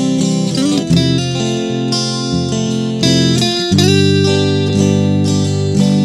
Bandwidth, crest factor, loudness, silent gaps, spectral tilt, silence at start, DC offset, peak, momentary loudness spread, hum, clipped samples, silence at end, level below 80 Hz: 13.5 kHz; 12 dB; -13 LUFS; none; -5.5 dB/octave; 0 s; under 0.1%; 0 dBFS; 6 LU; none; under 0.1%; 0 s; -42 dBFS